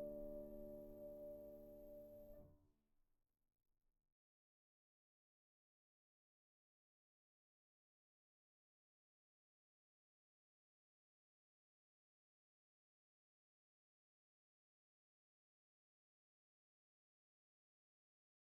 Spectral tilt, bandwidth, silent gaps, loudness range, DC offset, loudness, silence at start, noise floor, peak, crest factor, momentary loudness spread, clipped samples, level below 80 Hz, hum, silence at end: -8 dB/octave; 16.5 kHz; none; 9 LU; under 0.1%; -58 LUFS; 0 s; -83 dBFS; -42 dBFS; 22 dB; 9 LU; under 0.1%; -76 dBFS; none; 15.85 s